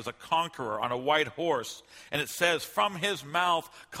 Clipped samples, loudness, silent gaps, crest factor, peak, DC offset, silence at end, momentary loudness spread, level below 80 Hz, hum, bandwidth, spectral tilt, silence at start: under 0.1%; -29 LUFS; none; 20 dB; -10 dBFS; under 0.1%; 0 s; 7 LU; -70 dBFS; none; 16 kHz; -3 dB/octave; 0 s